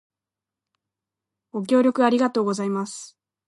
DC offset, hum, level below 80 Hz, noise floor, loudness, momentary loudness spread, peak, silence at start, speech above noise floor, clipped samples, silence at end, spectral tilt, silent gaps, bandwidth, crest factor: under 0.1%; none; -78 dBFS; -89 dBFS; -22 LUFS; 15 LU; -8 dBFS; 1.55 s; 67 dB; under 0.1%; 0.4 s; -5.5 dB/octave; none; 11.5 kHz; 18 dB